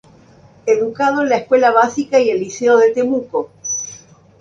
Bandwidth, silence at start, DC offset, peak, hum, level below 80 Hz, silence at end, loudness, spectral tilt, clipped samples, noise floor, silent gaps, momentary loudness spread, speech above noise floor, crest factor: 7.6 kHz; 0.65 s; under 0.1%; 0 dBFS; none; -60 dBFS; 0.45 s; -16 LUFS; -3.5 dB/octave; under 0.1%; -46 dBFS; none; 10 LU; 32 dB; 16 dB